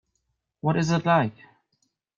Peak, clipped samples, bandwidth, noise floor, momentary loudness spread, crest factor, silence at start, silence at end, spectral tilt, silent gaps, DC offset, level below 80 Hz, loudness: -8 dBFS; under 0.1%; 7.4 kHz; -77 dBFS; 9 LU; 18 dB; 0.65 s; 0.85 s; -6.5 dB/octave; none; under 0.1%; -64 dBFS; -24 LUFS